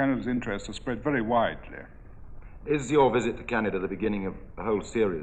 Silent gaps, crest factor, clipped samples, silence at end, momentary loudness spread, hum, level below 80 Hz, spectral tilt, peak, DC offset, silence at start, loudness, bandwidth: none; 18 dB; under 0.1%; 0 s; 14 LU; none; -46 dBFS; -6 dB/octave; -10 dBFS; under 0.1%; 0 s; -28 LUFS; 9 kHz